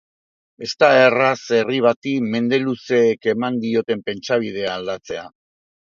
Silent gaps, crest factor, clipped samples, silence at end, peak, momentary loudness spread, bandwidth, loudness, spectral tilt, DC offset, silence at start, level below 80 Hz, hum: 1.96-2.02 s; 20 dB; under 0.1%; 0.65 s; 0 dBFS; 14 LU; 7.4 kHz; -18 LUFS; -5 dB/octave; under 0.1%; 0.6 s; -64 dBFS; none